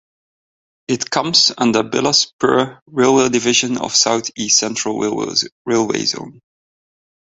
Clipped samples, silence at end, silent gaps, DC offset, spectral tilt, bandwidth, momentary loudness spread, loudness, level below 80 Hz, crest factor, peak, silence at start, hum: under 0.1%; 0.9 s; 2.33-2.39 s, 2.82-2.86 s, 5.52-5.65 s; under 0.1%; -2.5 dB/octave; 8.2 kHz; 7 LU; -16 LUFS; -58 dBFS; 18 dB; 0 dBFS; 0.9 s; none